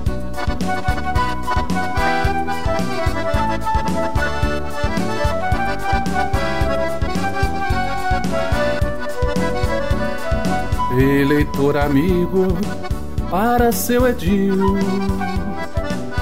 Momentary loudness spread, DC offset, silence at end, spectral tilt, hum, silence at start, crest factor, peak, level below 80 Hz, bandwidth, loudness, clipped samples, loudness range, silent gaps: 7 LU; 7%; 0 s; -6 dB/octave; none; 0 s; 14 dB; -4 dBFS; -28 dBFS; 16 kHz; -20 LUFS; under 0.1%; 3 LU; none